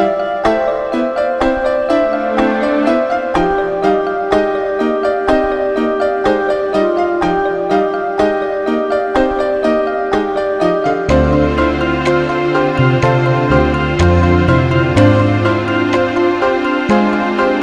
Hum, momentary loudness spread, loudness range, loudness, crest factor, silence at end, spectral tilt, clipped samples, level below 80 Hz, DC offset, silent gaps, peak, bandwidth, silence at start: none; 4 LU; 3 LU; -14 LUFS; 14 dB; 0 s; -7.5 dB/octave; under 0.1%; -30 dBFS; under 0.1%; none; 0 dBFS; 10 kHz; 0 s